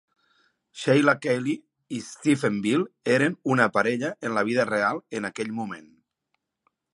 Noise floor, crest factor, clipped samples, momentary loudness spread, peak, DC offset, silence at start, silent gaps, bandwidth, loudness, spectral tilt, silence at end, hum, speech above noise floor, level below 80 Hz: -78 dBFS; 22 dB; under 0.1%; 13 LU; -4 dBFS; under 0.1%; 0.75 s; none; 11.5 kHz; -25 LUFS; -5.5 dB/octave; 1.15 s; none; 54 dB; -72 dBFS